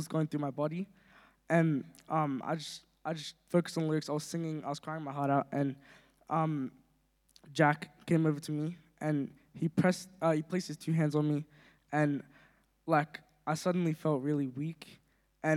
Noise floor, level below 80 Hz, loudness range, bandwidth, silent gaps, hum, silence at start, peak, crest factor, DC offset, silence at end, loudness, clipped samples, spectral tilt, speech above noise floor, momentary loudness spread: -72 dBFS; -76 dBFS; 2 LU; 14 kHz; none; none; 0 s; -12 dBFS; 22 dB; under 0.1%; 0 s; -34 LUFS; under 0.1%; -6.5 dB/octave; 39 dB; 12 LU